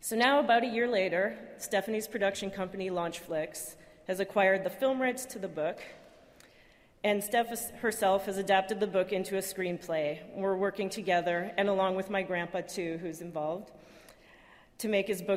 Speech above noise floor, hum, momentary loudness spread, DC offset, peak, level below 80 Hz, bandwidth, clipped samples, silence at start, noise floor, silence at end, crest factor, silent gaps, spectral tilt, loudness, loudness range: 30 dB; none; 11 LU; under 0.1%; -12 dBFS; -68 dBFS; 16 kHz; under 0.1%; 0 s; -61 dBFS; 0 s; 20 dB; none; -4 dB/octave; -31 LUFS; 3 LU